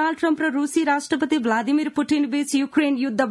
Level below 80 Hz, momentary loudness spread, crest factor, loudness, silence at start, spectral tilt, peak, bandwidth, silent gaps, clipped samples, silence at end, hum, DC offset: -68 dBFS; 1 LU; 14 dB; -21 LUFS; 0 s; -3.5 dB/octave; -8 dBFS; 12 kHz; none; under 0.1%; 0 s; none; under 0.1%